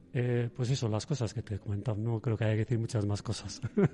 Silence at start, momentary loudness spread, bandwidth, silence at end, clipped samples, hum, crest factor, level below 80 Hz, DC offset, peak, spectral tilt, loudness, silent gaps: 0.1 s; 6 LU; 11 kHz; 0 s; under 0.1%; none; 16 dB; -60 dBFS; under 0.1%; -16 dBFS; -6.5 dB/octave; -33 LUFS; none